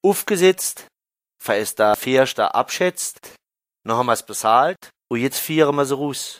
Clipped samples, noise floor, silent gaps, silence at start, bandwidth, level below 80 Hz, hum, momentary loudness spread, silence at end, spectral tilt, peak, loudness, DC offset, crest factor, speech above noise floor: under 0.1%; -81 dBFS; none; 0.05 s; 16 kHz; -64 dBFS; none; 11 LU; 0.05 s; -3.5 dB/octave; -2 dBFS; -19 LUFS; under 0.1%; 18 dB; 61 dB